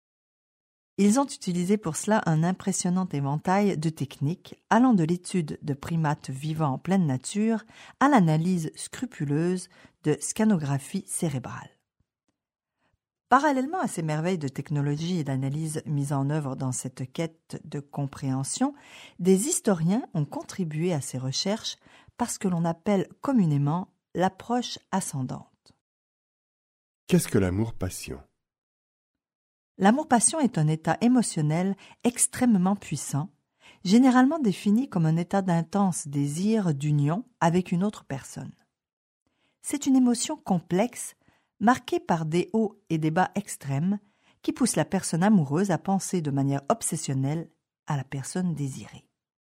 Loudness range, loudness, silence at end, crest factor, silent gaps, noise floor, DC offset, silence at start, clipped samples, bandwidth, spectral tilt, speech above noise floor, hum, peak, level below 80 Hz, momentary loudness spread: 6 LU; -26 LUFS; 0.6 s; 20 dB; 25.81-27.07 s, 28.58-29.14 s, 29.35-29.75 s, 38.93-39.26 s; -75 dBFS; under 0.1%; 1 s; under 0.1%; 16 kHz; -5.5 dB/octave; 50 dB; none; -6 dBFS; -62 dBFS; 12 LU